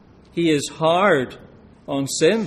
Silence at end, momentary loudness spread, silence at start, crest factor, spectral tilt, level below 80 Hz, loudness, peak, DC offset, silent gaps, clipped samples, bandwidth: 0 s; 12 LU; 0.35 s; 16 dB; -4.5 dB/octave; -56 dBFS; -20 LUFS; -4 dBFS; under 0.1%; none; under 0.1%; 14.5 kHz